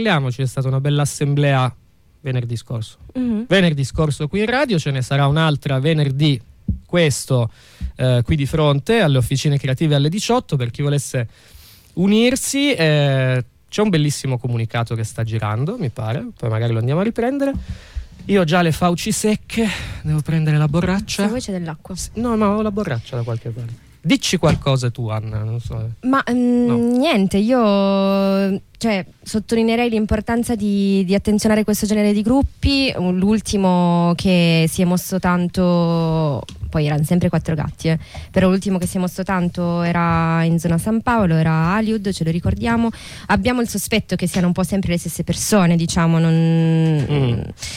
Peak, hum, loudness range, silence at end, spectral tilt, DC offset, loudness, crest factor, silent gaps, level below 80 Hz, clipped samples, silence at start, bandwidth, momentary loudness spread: -4 dBFS; none; 4 LU; 0 s; -6 dB/octave; under 0.1%; -18 LUFS; 14 dB; none; -38 dBFS; under 0.1%; 0 s; 16 kHz; 9 LU